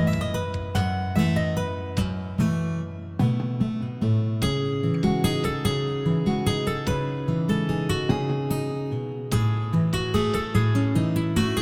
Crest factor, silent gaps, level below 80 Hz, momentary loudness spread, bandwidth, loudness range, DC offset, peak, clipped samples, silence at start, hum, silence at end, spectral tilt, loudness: 18 dB; none; -42 dBFS; 5 LU; 16.5 kHz; 2 LU; under 0.1%; -6 dBFS; under 0.1%; 0 s; none; 0 s; -6.5 dB/octave; -25 LUFS